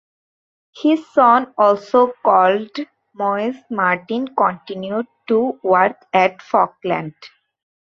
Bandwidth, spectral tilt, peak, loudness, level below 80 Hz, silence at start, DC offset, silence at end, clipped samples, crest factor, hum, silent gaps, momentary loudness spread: 7.2 kHz; -6.5 dB/octave; 0 dBFS; -17 LUFS; -66 dBFS; 0.75 s; under 0.1%; 0.55 s; under 0.1%; 18 dB; none; none; 11 LU